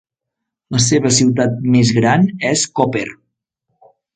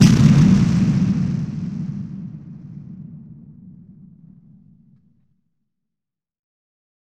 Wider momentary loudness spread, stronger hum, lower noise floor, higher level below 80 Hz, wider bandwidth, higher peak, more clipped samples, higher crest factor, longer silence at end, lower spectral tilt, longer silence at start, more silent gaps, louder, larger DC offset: second, 7 LU vs 25 LU; neither; second, -80 dBFS vs -86 dBFS; second, -50 dBFS vs -40 dBFS; second, 9.4 kHz vs 11.5 kHz; about the same, 0 dBFS vs -2 dBFS; neither; about the same, 16 dB vs 18 dB; second, 1.05 s vs 3.5 s; second, -4.5 dB/octave vs -7 dB/octave; first, 0.7 s vs 0 s; neither; first, -14 LUFS vs -17 LUFS; neither